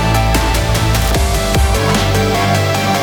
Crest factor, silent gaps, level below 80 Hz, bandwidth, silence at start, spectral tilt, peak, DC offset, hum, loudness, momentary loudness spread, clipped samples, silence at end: 12 dB; none; -18 dBFS; over 20 kHz; 0 s; -4.5 dB/octave; -2 dBFS; under 0.1%; none; -14 LUFS; 1 LU; under 0.1%; 0 s